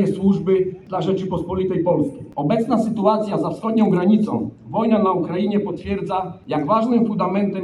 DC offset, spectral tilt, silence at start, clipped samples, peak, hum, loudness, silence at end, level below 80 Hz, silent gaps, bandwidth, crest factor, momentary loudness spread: under 0.1%; -8.5 dB/octave; 0 s; under 0.1%; -4 dBFS; none; -20 LUFS; 0 s; -50 dBFS; none; 10 kHz; 16 dB; 8 LU